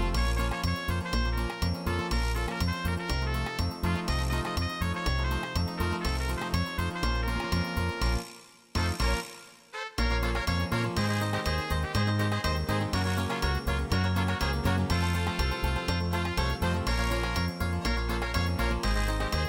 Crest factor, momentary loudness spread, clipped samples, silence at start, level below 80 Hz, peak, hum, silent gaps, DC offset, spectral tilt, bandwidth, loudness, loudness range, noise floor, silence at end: 14 dB; 3 LU; under 0.1%; 0 s; -34 dBFS; -14 dBFS; none; none; under 0.1%; -5 dB/octave; 17 kHz; -30 LUFS; 2 LU; -50 dBFS; 0 s